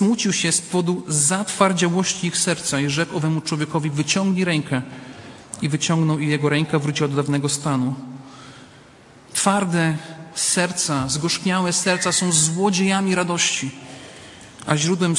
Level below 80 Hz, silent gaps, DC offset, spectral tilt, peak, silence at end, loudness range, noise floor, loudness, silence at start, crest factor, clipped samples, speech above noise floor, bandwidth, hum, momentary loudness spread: -58 dBFS; none; under 0.1%; -4 dB/octave; -2 dBFS; 0 s; 4 LU; -47 dBFS; -20 LUFS; 0 s; 20 dB; under 0.1%; 27 dB; 11.5 kHz; none; 17 LU